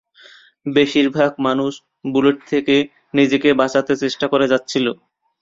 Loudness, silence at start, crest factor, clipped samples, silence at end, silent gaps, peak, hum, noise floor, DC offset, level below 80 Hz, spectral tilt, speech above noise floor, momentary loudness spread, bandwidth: -17 LUFS; 0.65 s; 16 dB; under 0.1%; 0.5 s; none; -2 dBFS; none; -47 dBFS; under 0.1%; -58 dBFS; -5 dB/octave; 30 dB; 7 LU; 7.6 kHz